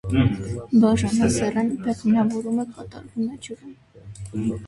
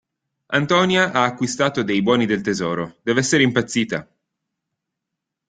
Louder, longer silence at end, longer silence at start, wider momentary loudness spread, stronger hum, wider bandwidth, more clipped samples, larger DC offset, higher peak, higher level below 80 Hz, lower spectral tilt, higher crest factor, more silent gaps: second, -22 LUFS vs -19 LUFS; second, 0 s vs 1.45 s; second, 0.05 s vs 0.5 s; first, 18 LU vs 7 LU; neither; first, 11.5 kHz vs 9.6 kHz; neither; neither; second, -6 dBFS vs -2 dBFS; first, -42 dBFS vs -58 dBFS; first, -6.5 dB/octave vs -4.5 dB/octave; about the same, 16 dB vs 20 dB; neither